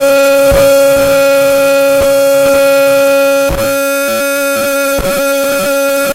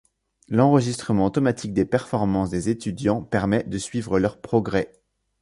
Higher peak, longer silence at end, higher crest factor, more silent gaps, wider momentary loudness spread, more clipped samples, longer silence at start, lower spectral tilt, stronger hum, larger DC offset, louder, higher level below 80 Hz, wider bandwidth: first, 0 dBFS vs -4 dBFS; second, 0 s vs 0.55 s; second, 8 dB vs 18 dB; neither; about the same, 5 LU vs 7 LU; neither; second, 0 s vs 0.5 s; second, -3 dB/octave vs -6.5 dB/octave; neither; neither; first, -9 LUFS vs -23 LUFS; first, -30 dBFS vs -48 dBFS; first, 16 kHz vs 11.5 kHz